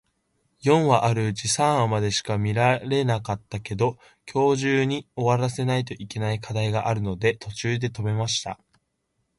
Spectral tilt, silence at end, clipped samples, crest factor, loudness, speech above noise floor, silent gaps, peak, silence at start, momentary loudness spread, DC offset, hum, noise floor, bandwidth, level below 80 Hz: -5 dB/octave; 0.85 s; under 0.1%; 20 dB; -24 LUFS; 51 dB; none; -4 dBFS; 0.65 s; 9 LU; under 0.1%; none; -75 dBFS; 11.5 kHz; -52 dBFS